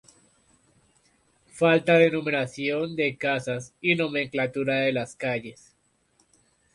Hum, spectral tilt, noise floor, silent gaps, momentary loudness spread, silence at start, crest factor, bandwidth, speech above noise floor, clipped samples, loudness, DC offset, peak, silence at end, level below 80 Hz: none; -5.5 dB/octave; -67 dBFS; none; 10 LU; 1.55 s; 20 dB; 11.5 kHz; 42 dB; under 0.1%; -25 LUFS; under 0.1%; -6 dBFS; 1.2 s; -66 dBFS